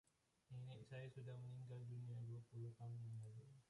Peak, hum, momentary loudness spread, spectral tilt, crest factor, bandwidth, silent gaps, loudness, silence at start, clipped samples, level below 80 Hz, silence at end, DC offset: -44 dBFS; none; 4 LU; -7.5 dB/octave; 10 dB; 11 kHz; none; -56 LUFS; 0.5 s; under 0.1%; -84 dBFS; 0.05 s; under 0.1%